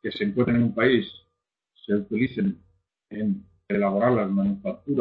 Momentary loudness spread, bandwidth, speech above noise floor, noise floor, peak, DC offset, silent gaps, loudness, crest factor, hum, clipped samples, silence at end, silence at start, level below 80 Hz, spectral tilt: 12 LU; 5 kHz; 55 dB; -79 dBFS; -6 dBFS; under 0.1%; none; -25 LUFS; 18 dB; none; under 0.1%; 0 s; 0.05 s; -58 dBFS; -10.5 dB/octave